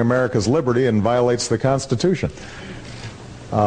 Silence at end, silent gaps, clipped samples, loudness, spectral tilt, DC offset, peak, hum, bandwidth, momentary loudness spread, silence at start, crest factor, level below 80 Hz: 0 s; none; under 0.1%; -19 LUFS; -6 dB/octave; under 0.1%; -4 dBFS; none; 10 kHz; 17 LU; 0 s; 16 dB; -44 dBFS